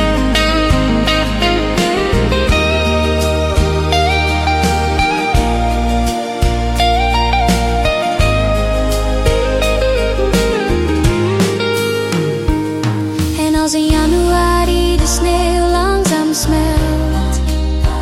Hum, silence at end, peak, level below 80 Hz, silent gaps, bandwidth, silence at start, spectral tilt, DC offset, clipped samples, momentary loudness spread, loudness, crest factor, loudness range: none; 0 s; -2 dBFS; -18 dBFS; none; 16 kHz; 0 s; -5 dB/octave; under 0.1%; under 0.1%; 4 LU; -14 LUFS; 12 dB; 2 LU